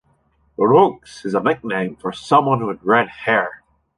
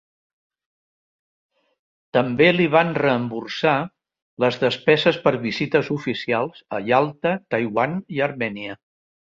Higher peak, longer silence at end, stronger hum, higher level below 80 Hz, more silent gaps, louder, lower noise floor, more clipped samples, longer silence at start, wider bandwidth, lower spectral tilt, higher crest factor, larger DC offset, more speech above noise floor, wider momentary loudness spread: about the same, -2 dBFS vs -2 dBFS; second, 0.4 s vs 0.6 s; neither; about the same, -60 dBFS vs -62 dBFS; second, none vs 4.22-4.37 s; first, -18 LUFS vs -21 LUFS; second, -61 dBFS vs under -90 dBFS; neither; second, 0.6 s vs 2.15 s; first, 11 kHz vs 7.6 kHz; about the same, -6.5 dB/octave vs -6.5 dB/octave; about the same, 18 dB vs 20 dB; neither; second, 43 dB vs over 69 dB; first, 14 LU vs 10 LU